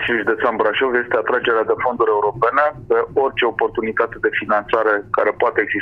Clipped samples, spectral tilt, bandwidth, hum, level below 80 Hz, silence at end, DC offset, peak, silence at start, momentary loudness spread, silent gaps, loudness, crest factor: under 0.1%; -7 dB/octave; 5 kHz; none; -52 dBFS; 0 s; under 0.1%; -2 dBFS; 0 s; 3 LU; none; -18 LUFS; 16 dB